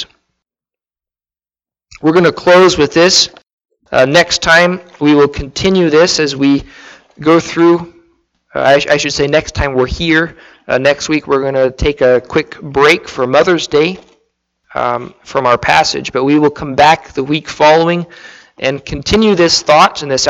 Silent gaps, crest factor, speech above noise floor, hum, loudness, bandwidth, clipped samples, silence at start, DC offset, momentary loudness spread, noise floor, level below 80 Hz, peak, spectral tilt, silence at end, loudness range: 3.53-3.58 s; 12 dB; over 79 dB; none; -11 LUFS; 13 kHz; under 0.1%; 0 s; under 0.1%; 9 LU; under -90 dBFS; -34 dBFS; 0 dBFS; -4 dB/octave; 0 s; 4 LU